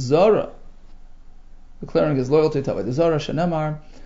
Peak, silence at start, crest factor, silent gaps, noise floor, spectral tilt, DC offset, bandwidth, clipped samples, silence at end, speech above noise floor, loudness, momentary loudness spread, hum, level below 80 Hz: -6 dBFS; 0 s; 16 dB; none; -40 dBFS; -7.5 dB/octave; under 0.1%; 7.8 kHz; under 0.1%; 0 s; 20 dB; -20 LUFS; 10 LU; none; -40 dBFS